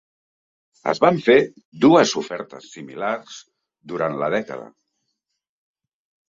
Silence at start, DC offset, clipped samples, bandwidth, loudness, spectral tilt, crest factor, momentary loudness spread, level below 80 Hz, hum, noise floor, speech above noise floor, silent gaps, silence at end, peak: 0.85 s; under 0.1%; under 0.1%; 7.8 kHz; -19 LUFS; -5 dB/octave; 20 dB; 22 LU; -64 dBFS; none; -77 dBFS; 57 dB; 1.65-1.72 s; 1.65 s; -2 dBFS